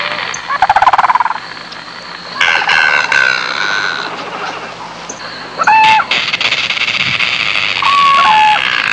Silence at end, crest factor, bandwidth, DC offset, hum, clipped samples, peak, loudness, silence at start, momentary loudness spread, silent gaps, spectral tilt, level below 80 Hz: 0 s; 12 dB; 10 kHz; 0.1%; none; under 0.1%; 0 dBFS; -10 LUFS; 0 s; 17 LU; none; -1 dB/octave; -50 dBFS